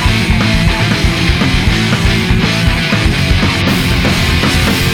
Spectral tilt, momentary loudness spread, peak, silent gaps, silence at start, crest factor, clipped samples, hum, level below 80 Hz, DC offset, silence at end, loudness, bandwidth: -5 dB/octave; 1 LU; 0 dBFS; none; 0 s; 10 dB; under 0.1%; none; -18 dBFS; under 0.1%; 0 s; -11 LUFS; 18.5 kHz